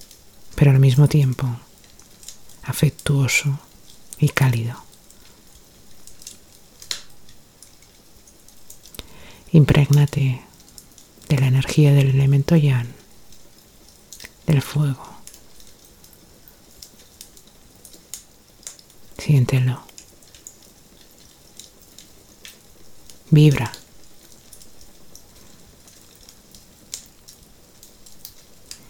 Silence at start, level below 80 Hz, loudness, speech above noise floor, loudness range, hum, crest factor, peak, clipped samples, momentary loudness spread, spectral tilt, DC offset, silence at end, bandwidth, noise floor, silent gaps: 0.45 s; -46 dBFS; -18 LUFS; 33 dB; 23 LU; none; 22 dB; 0 dBFS; under 0.1%; 28 LU; -6.5 dB/octave; under 0.1%; 0.75 s; 17 kHz; -49 dBFS; none